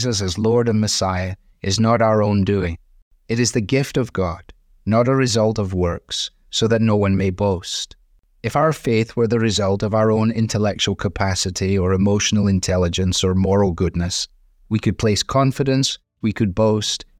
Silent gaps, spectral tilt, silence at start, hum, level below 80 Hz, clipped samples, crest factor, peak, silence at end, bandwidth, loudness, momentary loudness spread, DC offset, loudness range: 3.02-3.11 s; -5 dB/octave; 0 s; none; -44 dBFS; under 0.1%; 14 dB; -6 dBFS; 0.15 s; 14.5 kHz; -19 LUFS; 8 LU; under 0.1%; 2 LU